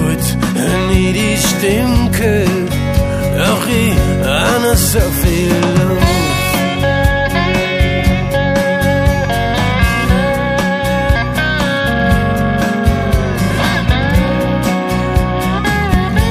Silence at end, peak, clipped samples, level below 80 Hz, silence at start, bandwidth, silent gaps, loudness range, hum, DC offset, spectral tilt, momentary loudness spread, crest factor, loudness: 0 s; 0 dBFS; under 0.1%; -20 dBFS; 0 s; 15.5 kHz; none; 1 LU; none; under 0.1%; -5 dB/octave; 3 LU; 12 dB; -13 LUFS